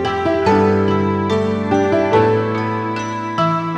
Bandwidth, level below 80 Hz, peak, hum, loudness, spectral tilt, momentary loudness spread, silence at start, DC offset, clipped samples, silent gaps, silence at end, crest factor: 9.2 kHz; -52 dBFS; -2 dBFS; none; -17 LUFS; -7 dB/octave; 7 LU; 0 s; under 0.1%; under 0.1%; none; 0 s; 16 dB